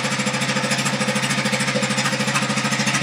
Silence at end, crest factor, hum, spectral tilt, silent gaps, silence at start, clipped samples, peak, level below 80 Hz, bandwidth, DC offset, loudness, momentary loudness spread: 0 s; 16 dB; none; -3 dB/octave; none; 0 s; under 0.1%; -6 dBFS; -62 dBFS; 16 kHz; under 0.1%; -20 LUFS; 1 LU